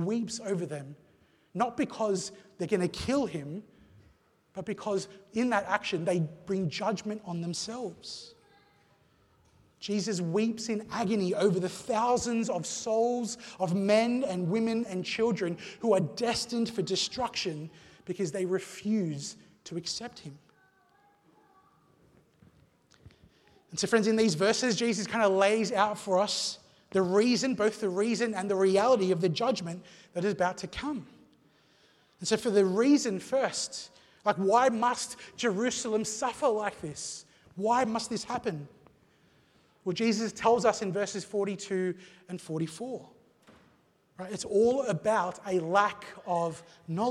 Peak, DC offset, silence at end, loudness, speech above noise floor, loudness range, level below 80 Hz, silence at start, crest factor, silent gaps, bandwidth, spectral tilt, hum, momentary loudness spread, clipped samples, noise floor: -10 dBFS; under 0.1%; 0 s; -30 LUFS; 37 dB; 8 LU; -66 dBFS; 0 s; 20 dB; none; 13 kHz; -4.5 dB/octave; none; 15 LU; under 0.1%; -66 dBFS